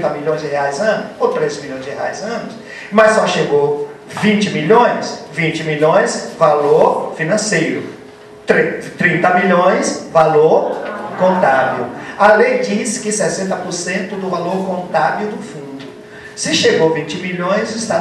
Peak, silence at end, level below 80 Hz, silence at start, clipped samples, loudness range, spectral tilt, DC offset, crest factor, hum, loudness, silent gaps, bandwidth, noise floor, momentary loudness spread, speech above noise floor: 0 dBFS; 0 s; -56 dBFS; 0 s; under 0.1%; 4 LU; -4.5 dB/octave; under 0.1%; 16 dB; none; -15 LUFS; none; 12.5 kHz; -37 dBFS; 14 LU; 22 dB